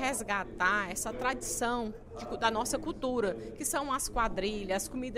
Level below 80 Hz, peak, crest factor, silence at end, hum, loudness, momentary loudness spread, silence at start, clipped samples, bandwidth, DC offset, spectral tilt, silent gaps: -48 dBFS; -16 dBFS; 18 dB; 0 s; none; -32 LUFS; 6 LU; 0 s; under 0.1%; 16 kHz; under 0.1%; -3 dB/octave; none